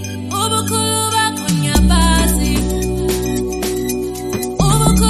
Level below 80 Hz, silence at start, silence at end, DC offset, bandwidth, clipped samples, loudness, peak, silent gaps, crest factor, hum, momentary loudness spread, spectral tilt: -22 dBFS; 0 s; 0 s; under 0.1%; 13.5 kHz; under 0.1%; -16 LUFS; 0 dBFS; none; 14 dB; none; 8 LU; -4.5 dB/octave